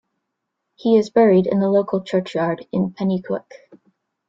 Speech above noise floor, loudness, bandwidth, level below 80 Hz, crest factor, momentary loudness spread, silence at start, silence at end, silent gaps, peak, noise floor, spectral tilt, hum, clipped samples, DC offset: 60 dB; -19 LUFS; 7.6 kHz; -62 dBFS; 16 dB; 10 LU; 0.85 s; 0.9 s; none; -4 dBFS; -78 dBFS; -8 dB/octave; none; under 0.1%; under 0.1%